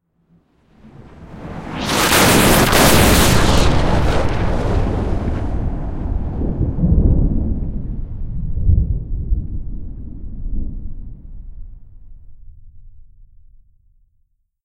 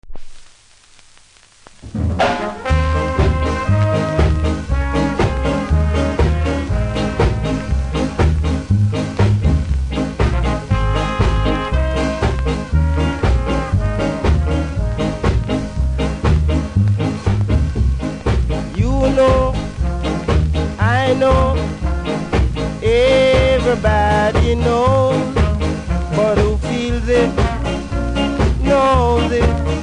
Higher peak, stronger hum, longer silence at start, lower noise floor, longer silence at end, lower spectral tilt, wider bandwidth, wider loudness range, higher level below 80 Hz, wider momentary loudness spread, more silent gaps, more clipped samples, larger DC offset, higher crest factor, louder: about the same, 0 dBFS vs -2 dBFS; neither; first, 0.85 s vs 0.05 s; first, -62 dBFS vs -47 dBFS; first, 1.05 s vs 0 s; second, -4.5 dB/octave vs -7 dB/octave; first, 16 kHz vs 10.5 kHz; first, 20 LU vs 3 LU; about the same, -22 dBFS vs -20 dBFS; first, 22 LU vs 7 LU; neither; neither; neither; about the same, 18 dB vs 14 dB; about the same, -16 LUFS vs -17 LUFS